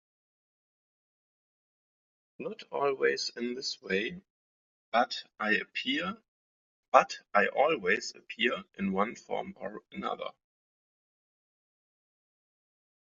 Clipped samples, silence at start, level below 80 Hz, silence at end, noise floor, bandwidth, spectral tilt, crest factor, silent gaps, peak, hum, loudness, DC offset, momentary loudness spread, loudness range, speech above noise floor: under 0.1%; 2.4 s; -78 dBFS; 2.8 s; under -90 dBFS; 7.4 kHz; -1.5 dB/octave; 30 dB; 4.30-4.92 s, 6.28-6.92 s; -4 dBFS; none; -31 LUFS; under 0.1%; 16 LU; 11 LU; over 59 dB